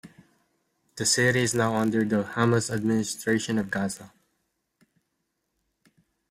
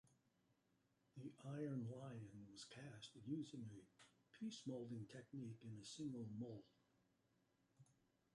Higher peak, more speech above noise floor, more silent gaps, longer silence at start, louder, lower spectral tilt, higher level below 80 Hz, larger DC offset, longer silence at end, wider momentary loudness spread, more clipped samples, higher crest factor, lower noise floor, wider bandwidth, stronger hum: first, -6 dBFS vs -38 dBFS; first, 53 dB vs 31 dB; neither; about the same, 0.05 s vs 0.05 s; first, -25 LUFS vs -54 LUFS; second, -4 dB/octave vs -6 dB/octave; first, -62 dBFS vs -86 dBFS; neither; first, 2.25 s vs 0.4 s; about the same, 8 LU vs 9 LU; neither; about the same, 22 dB vs 18 dB; second, -78 dBFS vs -84 dBFS; first, 16 kHz vs 11 kHz; neither